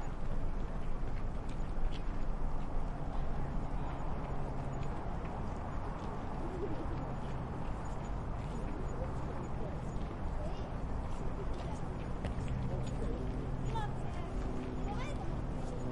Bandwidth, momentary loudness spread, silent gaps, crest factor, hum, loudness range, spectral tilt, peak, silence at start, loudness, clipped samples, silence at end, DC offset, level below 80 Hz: 10 kHz; 3 LU; none; 12 dB; none; 2 LU; -7.5 dB/octave; -24 dBFS; 0 s; -41 LUFS; under 0.1%; 0 s; under 0.1%; -40 dBFS